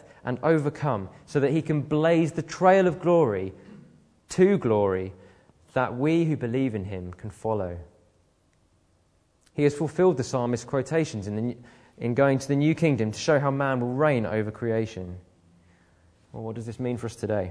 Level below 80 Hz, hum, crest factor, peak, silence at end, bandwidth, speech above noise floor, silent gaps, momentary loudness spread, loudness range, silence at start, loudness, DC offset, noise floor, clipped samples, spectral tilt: -60 dBFS; none; 20 dB; -6 dBFS; 0 s; 11 kHz; 41 dB; none; 14 LU; 7 LU; 0.25 s; -25 LUFS; under 0.1%; -65 dBFS; under 0.1%; -7 dB/octave